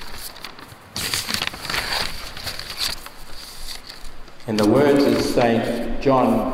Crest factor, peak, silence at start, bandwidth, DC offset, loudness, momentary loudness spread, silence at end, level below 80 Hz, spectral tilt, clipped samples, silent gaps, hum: 18 dB; -4 dBFS; 0 s; 16 kHz; under 0.1%; -20 LUFS; 20 LU; 0 s; -38 dBFS; -4.5 dB/octave; under 0.1%; none; none